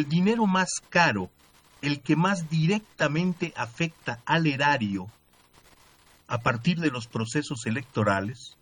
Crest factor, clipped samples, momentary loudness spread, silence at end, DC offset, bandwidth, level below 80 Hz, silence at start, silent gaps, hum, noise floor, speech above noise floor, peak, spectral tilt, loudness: 20 dB; under 0.1%; 10 LU; 0.15 s; under 0.1%; 10.5 kHz; -62 dBFS; 0 s; none; none; -58 dBFS; 32 dB; -6 dBFS; -5.5 dB/octave; -26 LUFS